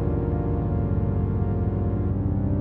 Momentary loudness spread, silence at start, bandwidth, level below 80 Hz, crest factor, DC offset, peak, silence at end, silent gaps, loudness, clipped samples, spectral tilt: 1 LU; 0 s; 3 kHz; -32 dBFS; 10 dB; under 0.1%; -12 dBFS; 0 s; none; -25 LUFS; under 0.1%; -13 dB/octave